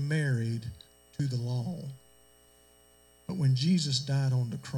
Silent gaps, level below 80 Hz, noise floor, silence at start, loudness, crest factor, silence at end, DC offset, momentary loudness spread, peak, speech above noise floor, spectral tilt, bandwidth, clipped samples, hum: none; -62 dBFS; -61 dBFS; 0 s; -30 LUFS; 14 dB; 0 s; under 0.1%; 17 LU; -16 dBFS; 32 dB; -5.5 dB/octave; 16.5 kHz; under 0.1%; 60 Hz at -50 dBFS